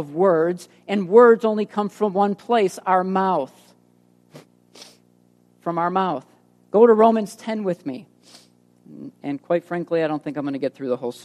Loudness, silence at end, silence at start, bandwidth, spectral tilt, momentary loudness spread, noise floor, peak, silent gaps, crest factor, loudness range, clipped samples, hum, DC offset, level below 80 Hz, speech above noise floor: -20 LUFS; 0.15 s; 0 s; 13 kHz; -6.5 dB/octave; 18 LU; -58 dBFS; 0 dBFS; none; 20 dB; 8 LU; under 0.1%; 60 Hz at -50 dBFS; under 0.1%; -74 dBFS; 38 dB